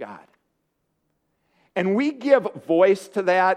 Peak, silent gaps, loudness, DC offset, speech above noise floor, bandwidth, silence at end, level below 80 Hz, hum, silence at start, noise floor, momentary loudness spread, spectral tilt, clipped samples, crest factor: -2 dBFS; none; -21 LUFS; under 0.1%; 53 dB; 11.5 kHz; 0 s; -78 dBFS; none; 0 s; -74 dBFS; 9 LU; -6 dB/octave; under 0.1%; 20 dB